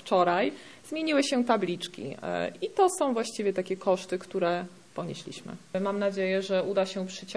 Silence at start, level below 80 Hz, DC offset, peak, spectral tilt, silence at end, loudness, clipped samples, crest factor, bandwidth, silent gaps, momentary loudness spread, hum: 0.05 s; -74 dBFS; 0.1%; -10 dBFS; -4.5 dB/octave; 0 s; -29 LUFS; under 0.1%; 20 dB; 11 kHz; none; 12 LU; none